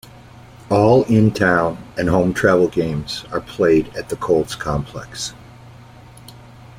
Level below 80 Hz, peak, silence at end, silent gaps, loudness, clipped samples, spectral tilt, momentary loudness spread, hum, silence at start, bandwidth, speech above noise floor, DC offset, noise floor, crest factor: -42 dBFS; -2 dBFS; 0.45 s; none; -18 LUFS; under 0.1%; -6 dB/octave; 13 LU; none; 0.7 s; 16 kHz; 24 dB; under 0.1%; -42 dBFS; 18 dB